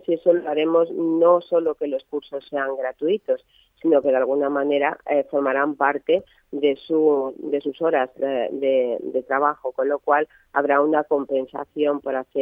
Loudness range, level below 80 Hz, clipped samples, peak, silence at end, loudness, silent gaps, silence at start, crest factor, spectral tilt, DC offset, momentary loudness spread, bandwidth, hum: 1 LU; -68 dBFS; under 0.1%; -4 dBFS; 0 s; -22 LUFS; none; 0.1 s; 18 dB; -8 dB/octave; under 0.1%; 8 LU; 4.7 kHz; none